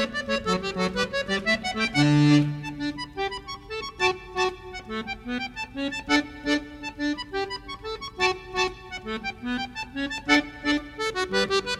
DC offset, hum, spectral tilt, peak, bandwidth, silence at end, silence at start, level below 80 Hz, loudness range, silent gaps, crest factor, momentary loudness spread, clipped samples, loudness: under 0.1%; none; -5 dB/octave; -6 dBFS; 12.5 kHz; 0 s; 0 s; -48 dBFS; 5 LU; none; 20 dB; 12 LU; under 0.1%; -26 LUFS